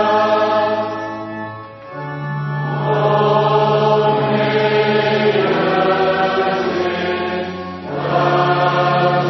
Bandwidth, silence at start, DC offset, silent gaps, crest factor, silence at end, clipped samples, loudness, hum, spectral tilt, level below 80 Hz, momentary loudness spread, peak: 6.2 kHz; 0 s; under 0.1%; none; 14 dB; 0 s; under 0.1%; -16 LUFS; none; -7 dB/octave; -56 dBFS; 12 LU; -2 dBFS